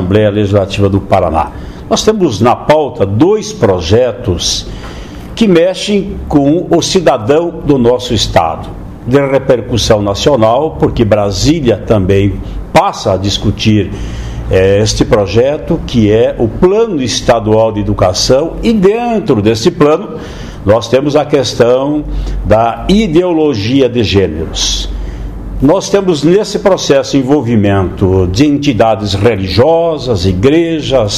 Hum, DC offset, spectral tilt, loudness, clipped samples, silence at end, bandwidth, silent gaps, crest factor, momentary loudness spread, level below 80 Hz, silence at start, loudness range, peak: none; 0.4%; -5.5 dB/octave; -10 LUFS; 0.5%; 0 s; 14 kHz; none; 10 dB; 6 LU; -26 dBFS; 0 s; 2 LU; 0 dBFS